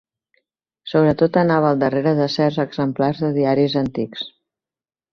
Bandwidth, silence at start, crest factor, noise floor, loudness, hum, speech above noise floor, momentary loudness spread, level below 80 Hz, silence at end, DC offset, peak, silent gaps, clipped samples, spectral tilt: 6.8 kHz; 0.85 s; 16 dB; under -90 dBFS; -19 LUFS; none; over 72 dB; 11 LU; -54 dBFS; 0.85 s; under 0.1%; -2 dBFS; none; under 0.1%; -8 dB/octave